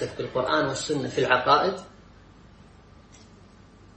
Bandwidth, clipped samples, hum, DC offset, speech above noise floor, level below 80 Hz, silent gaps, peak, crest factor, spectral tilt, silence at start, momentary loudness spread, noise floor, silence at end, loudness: 8.8 kHz; under 0.1%; none; under 0.1%; 27 dB; -56 dBFS; none; -6 dBFS; 22 dB; -4 dB/octave; 0 s; 9 LU; -51 dBFS; 2.1 s; -24 LUFS